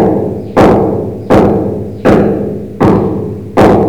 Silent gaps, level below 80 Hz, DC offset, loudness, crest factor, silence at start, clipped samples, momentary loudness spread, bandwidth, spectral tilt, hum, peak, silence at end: none; -30 dBFS; 1%; -10 LUFS; 10 dB; 0 s; under 0.1%; 9 LU; 17.5 kHz; -8.5 dB/octave; none; 0 dBFS; 0 s